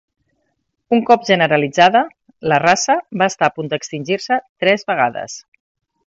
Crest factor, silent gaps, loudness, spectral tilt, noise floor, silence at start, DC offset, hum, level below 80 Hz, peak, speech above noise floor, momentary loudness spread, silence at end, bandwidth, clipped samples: 18 dB; 4.49-4.56 s; -16 LUFS; -4 dB/octave; -70 dBFS; 0.9 s; under 0.1%; none; -62 dBFS; 0 dBFS; 54 dB; 12 LU; 0.65 s; 8 kHz; under 0.1%